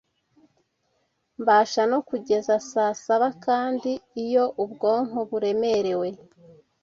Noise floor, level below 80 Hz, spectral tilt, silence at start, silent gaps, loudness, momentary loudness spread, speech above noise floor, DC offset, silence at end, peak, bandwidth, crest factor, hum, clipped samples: -72 dBFS; -70 dBFS; -4.5 dB/octave; 1.4 s; none; -24 LUFS; 8 LU; 49 dB; under 0.1%; 0.65 s; -8 dBFS; 7.6 kHz; 18 dB; none; under 0.1%